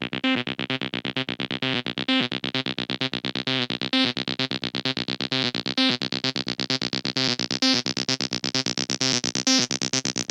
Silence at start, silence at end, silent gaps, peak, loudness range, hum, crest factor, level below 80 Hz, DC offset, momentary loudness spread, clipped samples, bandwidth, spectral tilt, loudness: 0 s; 0.05 s; none; -4 dBFS; 3 LU; none; 22 dB; -62 dBFS; under 0.1%; 6 LU; under 0.1%; 13.5 kHz; -2.5 dB/octave; -24 LUFS